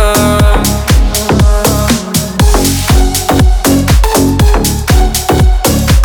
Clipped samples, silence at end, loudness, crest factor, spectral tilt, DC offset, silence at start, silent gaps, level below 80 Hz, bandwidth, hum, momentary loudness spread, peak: under 0.1%; 0 s; -9 LUFS; 8 dB; -4.5 dB/octave; under 0.1%; 0 s; none; -10 dBFS; 19.5 kHz; none; 2 LU; 0 dBFS